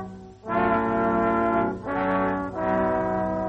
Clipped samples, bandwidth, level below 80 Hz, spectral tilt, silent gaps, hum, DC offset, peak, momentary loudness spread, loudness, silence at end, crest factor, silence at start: under 0.1%; 8 kHz; -46 dBFS; -9 dB/octave; none; none; under 0.1%; -10 dBFS; 5 LU; -24 LUFS; 0 s; 14 dB; 0 s